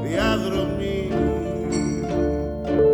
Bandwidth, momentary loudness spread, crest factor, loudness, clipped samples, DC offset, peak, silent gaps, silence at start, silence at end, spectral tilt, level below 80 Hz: 18 kHz; 4 LU; 14 dB; -23 LUFS; under 0.1%; under 0.1%; -8 dBFS; none; 0 s; 0 s; -6 dB/octave; -34 dBFS